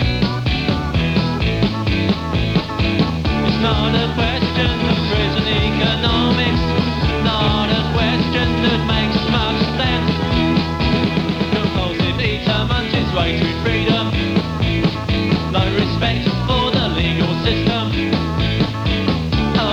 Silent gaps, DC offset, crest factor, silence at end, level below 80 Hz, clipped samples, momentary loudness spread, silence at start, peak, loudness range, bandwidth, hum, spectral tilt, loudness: none; under 0.1%; 14 dB; 0 s; -28 dBFS; under 0.1%; 3 LU; 0 s; -2 dBFS; 1 LU; 9.6 kHz; none; -6.5 dB/octave; -17 LUFS